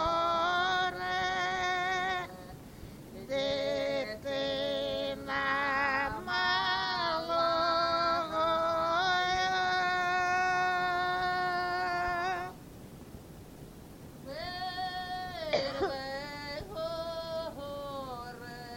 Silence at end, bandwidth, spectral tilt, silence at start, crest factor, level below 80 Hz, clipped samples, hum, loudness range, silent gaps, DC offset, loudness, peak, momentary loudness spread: 0 s; 16.5 kHz; -3.5 dB/octave; 0 s; 16 dB; -56 dBFS; under 0.1%; none; 8 LU; none; under 0.1%; -31 LUFS; -16 dBFS; 20 LU